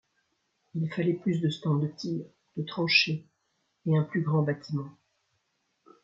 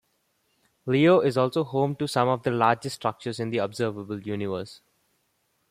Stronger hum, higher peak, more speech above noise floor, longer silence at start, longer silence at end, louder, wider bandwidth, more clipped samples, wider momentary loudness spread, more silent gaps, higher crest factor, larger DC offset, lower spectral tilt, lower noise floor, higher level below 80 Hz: neither; second, -10 dBFS vs -6 dBFS; about the same, 48 dB vs 47 dB; about the same, 0.75 s vs 0.85 s; first, 1.15 s vs 0.95 s; second, -29 LUFS vs -25 LUFS; second, 7.6 kHz vs 15.5 kHz; neither; about the same, 15 LU vs 13 LU; neither; about the same, 22 dB vs 20 dB; neither; about the same, -6.5 dB/octave vs -6.5 dB/octave; first, -76 dBFS vs -72 dBFS; second, -74 dBFS vs -68 dBFS